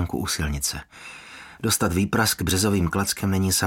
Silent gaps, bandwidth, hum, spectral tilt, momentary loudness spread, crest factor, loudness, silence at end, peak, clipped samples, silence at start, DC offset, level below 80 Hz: none; 17 kHz; none; -4 dB/octave; 18 LU; 18 dB; -23 LUFS; 0 s; -6 dBFS; under 0.1%; 0 s; under 0.1%; -40 dBFS